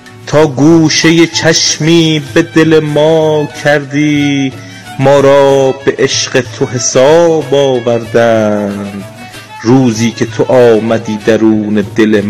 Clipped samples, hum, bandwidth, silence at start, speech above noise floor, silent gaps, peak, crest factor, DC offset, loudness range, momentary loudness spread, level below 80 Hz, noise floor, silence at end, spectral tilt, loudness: 4%; none; 13.5 kHz; 0.05 s; 20 dB; none; 0 dBFS; 8 dB; under 0.1%; 3 LU; 9 LU; -46 dBFS; -28 dBFS; 0 s; -4.5 dB/octave; -9 LUFS